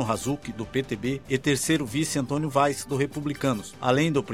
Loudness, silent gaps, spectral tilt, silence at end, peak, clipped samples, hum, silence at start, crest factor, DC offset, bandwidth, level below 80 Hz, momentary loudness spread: -26 LUFS; none; -5 dB/octave; 0 s; -8 dBFS; under 0.1%; none; 0 s; 18 dB; 0.2%; 16.5 kHz; -54 dBFS; 7 LU